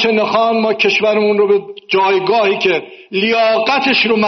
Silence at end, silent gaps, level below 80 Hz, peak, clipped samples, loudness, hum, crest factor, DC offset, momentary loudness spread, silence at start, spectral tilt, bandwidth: 0 s; none; -60 dBFS; -2 dBFS; under 0.1%; -13 LUFS; none; 12 dB; under 0.1%; 5 LU; 0 s; -1.5 dB/octave; 6.4 kHz